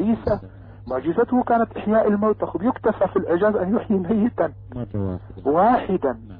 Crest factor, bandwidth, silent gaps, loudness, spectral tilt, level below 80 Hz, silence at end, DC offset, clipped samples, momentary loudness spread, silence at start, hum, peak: 14 dB; 5 kHz; none; -21 LUFS; -11.5 dB/octave; -46 dBFS; 0 s; under 0.1%; under 0.1%; 10 LU; 0 s; none; -8 dBFS